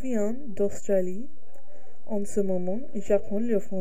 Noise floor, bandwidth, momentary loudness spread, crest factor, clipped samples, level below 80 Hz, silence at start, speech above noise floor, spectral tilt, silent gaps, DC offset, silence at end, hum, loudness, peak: -55 dBFS; 15.5 kHz; 8 LU; 18 dB; under 0.1%; -56 dBFS; 0 s; 27 dB; -7.5 dB/octave; none; 6%; 0 s; none; -29 LUFS; -10 dBFS